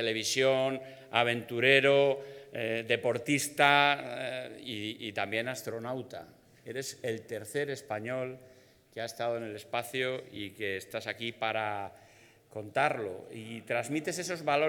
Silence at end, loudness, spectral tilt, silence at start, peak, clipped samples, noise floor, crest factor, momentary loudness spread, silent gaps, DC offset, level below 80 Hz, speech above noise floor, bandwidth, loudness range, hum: 0 s; -31 LUFS; -3.5 dB/octave; 0 s; -8 dBFS; under 0.1%; -59 dBFS; 24 dB; 16 LU; none; under 0.1%; -80 dBFS; 27 dB; 19 kHz; 10 LU; none